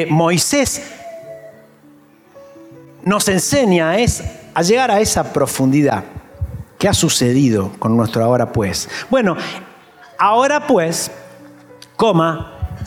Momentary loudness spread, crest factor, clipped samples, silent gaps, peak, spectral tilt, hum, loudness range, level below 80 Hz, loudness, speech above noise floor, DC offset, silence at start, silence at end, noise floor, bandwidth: 15 LU; 14 dB; under 0.1%; none; -2 dBFS; -4.5 dB/octave; none; 4 LU; -40 dBFS; -16 LUFS; 32 dB; under 0.1%; 0 s; 0 s; -47 dBFS; 17.5 kHz